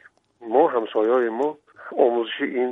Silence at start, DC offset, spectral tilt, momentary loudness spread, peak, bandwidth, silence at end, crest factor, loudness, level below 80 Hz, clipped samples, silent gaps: 0.4 s; under 0.1%; -6.5 dB/octave; 12 LU; -4 dBFS; 3.9 kHz; 0 s; 18 dB; -22 LUFS; -80 dBFS; under 0.1%; none